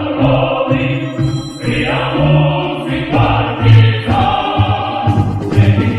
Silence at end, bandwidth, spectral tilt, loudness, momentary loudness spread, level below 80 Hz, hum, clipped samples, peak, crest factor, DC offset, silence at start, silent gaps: 0 s; 10.5 kHz; -7.5 dB/octave; -13 LUFS; 8 LU; -30 dBFS; none; under 0.1%; 0 dBFS; 12 dB; under 0.1%; 0 s; none